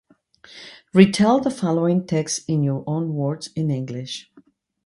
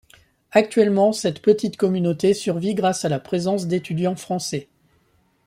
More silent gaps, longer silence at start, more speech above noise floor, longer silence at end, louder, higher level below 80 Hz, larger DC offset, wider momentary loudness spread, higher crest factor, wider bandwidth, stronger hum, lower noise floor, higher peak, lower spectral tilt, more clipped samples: neither; about the same, 0.55 s vs 0.55 s; second, 35 dB vs 42 dB; second, 0.65 s vs 0.85 s; about the same, -21 LUFS vs -21 LUFS; about the same, -60 dBFS vs -62 dBFS; neither; first, 17 LU vs 8 LU; about the same, 20 dB vs 20 dB; second, 11.5 kHz vs 15 kHz; neither; second, -55 dBFS vs -62 dBFS; about the same, 0 dBFS vs -2 dBFS; about the same, -6 dB/octave vs -5.5 dB/octave; neither